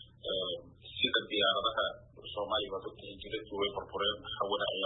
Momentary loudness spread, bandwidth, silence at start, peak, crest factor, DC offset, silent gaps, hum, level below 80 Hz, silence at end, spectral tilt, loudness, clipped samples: 14 LU; 4.1 kHz; 0 s; -16 dBFS; 20 dB; under 0.1%; none; none; -62 dBFS; 0 s; -7 dB/octave; -34 LUFS; under 0.1%